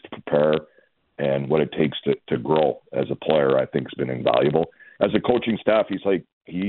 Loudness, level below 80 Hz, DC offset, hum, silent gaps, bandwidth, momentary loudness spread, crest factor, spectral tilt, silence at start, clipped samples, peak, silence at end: -22 LUFS; -56 dBFS; under 0.1%; none; 6.33-6.41 s; 4.3 kHz; 7 LU; 18 dB; -11 dB/octave; 0.05 s; under 0.1%; -4 dBFS; 0 s